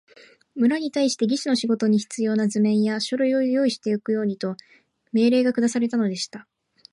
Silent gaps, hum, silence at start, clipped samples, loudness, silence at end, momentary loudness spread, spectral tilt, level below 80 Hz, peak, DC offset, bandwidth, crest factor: none; none; 0.55 s; under 0.1%; -22 LUFS; 0.5 s; 10 LU; -5 dB/octave; -74 dBFS; -10 dBFS; under 0.1%; 11.5 kHz; 14 dB